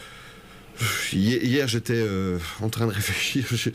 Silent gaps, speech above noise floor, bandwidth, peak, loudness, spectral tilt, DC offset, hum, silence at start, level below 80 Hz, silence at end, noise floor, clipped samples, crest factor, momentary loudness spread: none; 21 dB; 15.5 kHz; -12 dBFS; -25 LUFS; -4.5 dB/octave; under 0.1%; none; 0 s; -50 dBFS; 0 s; -45 dBFS; under 0.1%; 14 dB; 17 LU